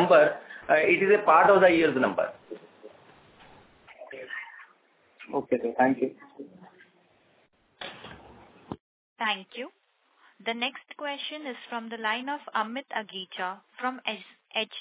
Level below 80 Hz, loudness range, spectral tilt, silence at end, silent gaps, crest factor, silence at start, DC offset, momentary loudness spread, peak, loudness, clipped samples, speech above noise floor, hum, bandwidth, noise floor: -70 dBFS; 14 LU; -8.5 dB/octave; 0 s; 8.80-9.16 s; 22 dB; 0 s; under 0.1%; 24 LU; -6 dBFS; -26 LUFS; under 0.1%; 40 dB; none; 4 kHz; -66 dBFS